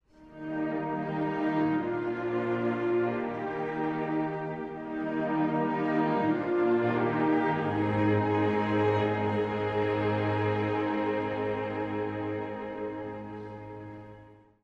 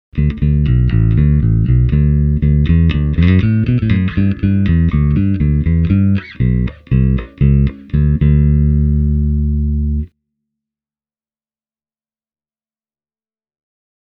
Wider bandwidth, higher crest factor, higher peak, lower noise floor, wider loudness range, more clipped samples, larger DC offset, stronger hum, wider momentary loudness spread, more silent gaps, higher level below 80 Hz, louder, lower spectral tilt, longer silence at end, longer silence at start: first, 6.6 kHz vs 4.7 kHz; about the same, 14 dB vs 14 dB; second, -16 dBFS vs 0 dBFS; second, -53 dBFS vs under -90 dBFS; about the same, 5 LU vs 7 LU; neither; neither; neither; first, 11 LU vs 5 LU; neither; second, -62 dBFS vs -20 dBFS; second, -29 LUFS vs -14 LUFS; second, -9 dB/octave vs -11 dB/octave; second, 0.3 s vs 4.1 s; about the same, 0.2 s vs 0.15 s